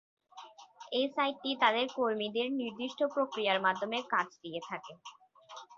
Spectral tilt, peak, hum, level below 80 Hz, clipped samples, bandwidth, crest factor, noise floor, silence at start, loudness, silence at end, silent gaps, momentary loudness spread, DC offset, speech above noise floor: -1 dB/octave; -12 dBFS; none; -82 dBFS; under 0.1%; 7.6 kHz; 22 dB; -53 dBFS; 0.35 s; -33 LUFS; 0 s; none; 23 LU; under 0.1%; 21 dB